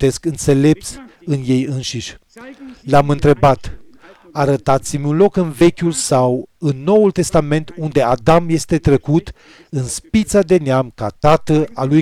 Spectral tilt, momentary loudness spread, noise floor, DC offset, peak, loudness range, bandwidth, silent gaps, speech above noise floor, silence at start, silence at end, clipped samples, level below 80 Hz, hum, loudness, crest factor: -6 dB/octave; 11 LU; -43 dBFS; under 0.1%; -4 dBFS; 3 LU; 14.5 kHz; none; 28 dB; 0 s; 0 s; under 0.1%; -36 dBFS; none; -15 LUFS; 12 dB